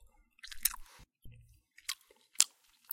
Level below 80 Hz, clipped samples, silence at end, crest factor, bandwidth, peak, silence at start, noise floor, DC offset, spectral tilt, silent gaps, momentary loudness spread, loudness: -60 dBFS; under 0.1%; 0 s; 40 dB; 16.5 kHz; 0 dBFS; 0.45 s; -63 dBFS; under 0.1%; 2.5 dB/octave; none; 22 LU; -34 LUFS